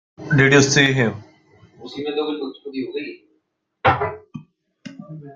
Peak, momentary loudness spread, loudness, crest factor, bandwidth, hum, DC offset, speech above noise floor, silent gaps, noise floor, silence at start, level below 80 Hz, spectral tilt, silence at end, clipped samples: -2 dBFS; 25 LU; -19 LUFS; 20 dB; 9.2 kHz; none; under 0.1%; 51 dB; none; -70 dBFS; 0.2 s; -54 dBFS; -4.5 dB/octave; 0 s; under 0.1%